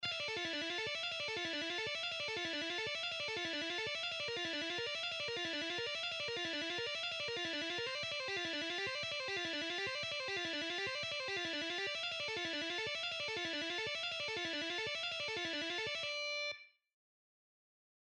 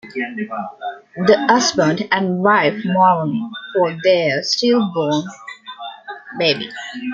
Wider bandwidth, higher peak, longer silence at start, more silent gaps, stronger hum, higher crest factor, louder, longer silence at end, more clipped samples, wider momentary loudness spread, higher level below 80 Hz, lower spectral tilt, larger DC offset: first, 11.5 kHz vs 7.6 kHz; second, -28 dBFS vs -2 dBFS; about the same, 0 s vs 0.05 s; neither; neither; about the same, 14 dB vs 16 dB; second, -38 LUFS vs -17 LUFS; first, 1.35 s vs 0 s; neither; second, 1 LU vs 17 LU; second, -78 dBFS vs -62 dBFS; second, -2 dB/octave vs -4.5 dB/octave; neither